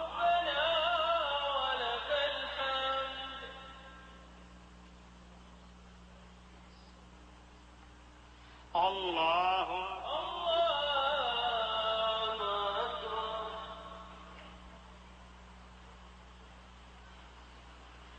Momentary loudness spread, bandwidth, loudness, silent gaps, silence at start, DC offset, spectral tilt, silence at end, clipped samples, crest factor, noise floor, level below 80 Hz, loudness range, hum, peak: 25 LU; 8.8 kHz; -33 LUFS; none; 0 s; under 0.1%; -3.5 dB/octave; 0 s; under 0.1%; 18 dB; -56 dBFS; -58 dBFS; 23 LU; 60 Hz at -55 dBFS; -18 dBFS